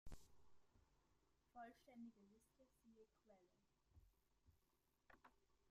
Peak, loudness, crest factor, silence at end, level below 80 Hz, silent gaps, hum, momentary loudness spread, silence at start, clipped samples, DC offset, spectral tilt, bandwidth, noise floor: -46 dBFS; -64 LUFS; 20 dB; 0 s; -74 dBFS; none; none; 6 LU; 0.05 s; under 0.1%; under 0.1%; -5.5 dB/octave; 15 kHz; -86 dBFS